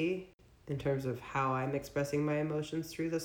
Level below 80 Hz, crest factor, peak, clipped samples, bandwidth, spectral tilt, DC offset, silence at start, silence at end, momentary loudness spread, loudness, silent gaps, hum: -62 dBFS; 14 dB; -20 dBFS; under 0.1%; 19.5 kHz; -6.5 dB/octave; under 0.1%; 0 s; 0 s; 7 LU; -36 LUFS; 0.34-0.38 s; none